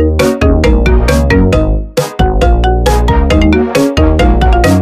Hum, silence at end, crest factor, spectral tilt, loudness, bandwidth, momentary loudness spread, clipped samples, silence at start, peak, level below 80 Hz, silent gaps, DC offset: none; 0 s; 8 dB; -6.5 dB/octave; -10 LUFS; 15 kHz; 4 LU; under 0.1%; 0 s; 0 dBFS; -12 dBFS; none; under 0.1%